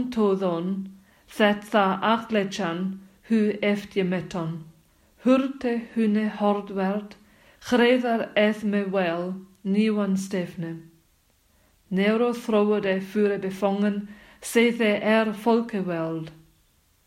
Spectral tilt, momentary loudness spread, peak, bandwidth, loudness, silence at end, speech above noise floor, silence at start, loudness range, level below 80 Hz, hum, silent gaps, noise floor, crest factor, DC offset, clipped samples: -6 dB/octave; 12 LU; -6 dBFS; 15 kHz; -24 LUFS; 0.75 s; 40 dB; 0 s; 3 LU; -64 dBFS; none; none; -64 dBFS; 18 dB; under 0.1%; under 0.1%